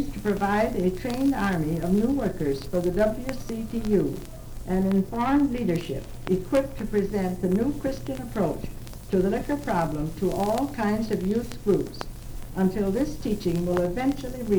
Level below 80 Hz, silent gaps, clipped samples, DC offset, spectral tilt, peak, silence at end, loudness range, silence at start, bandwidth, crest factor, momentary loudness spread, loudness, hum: -38 dBFS; none; under 0.1%; under 0.1%; -7 dB/octave; -10 dBFS; 0 s; 2 LU; 0 s; over 20 kHz; 16 dB; 9 LU; -26 LUFS; none